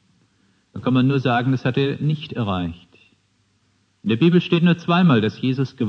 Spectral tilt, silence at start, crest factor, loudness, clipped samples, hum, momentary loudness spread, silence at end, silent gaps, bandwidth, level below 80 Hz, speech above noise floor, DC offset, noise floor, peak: -8.5 dB/octave; 0.75 s; 16 dB; -19 LUFS; under 0.1%; none; 10 LU; 0 s; none; 6.4 kHz; -56 dBFS; 45 dB; under 0.1%; -64 dBFS; -4 dBFS